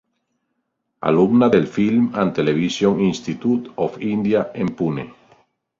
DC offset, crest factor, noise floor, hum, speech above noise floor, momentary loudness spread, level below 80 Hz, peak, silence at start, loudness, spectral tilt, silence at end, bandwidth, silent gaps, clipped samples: under 0.1%; 18 dB; -74 dBFS; none; 56 dB; 9 LU; -54 dBFS; -2 dBFS; 1 s; -19 LUFS; -7 dB/octave; 0.65 s; 7.6 kHz; none; under 0.1%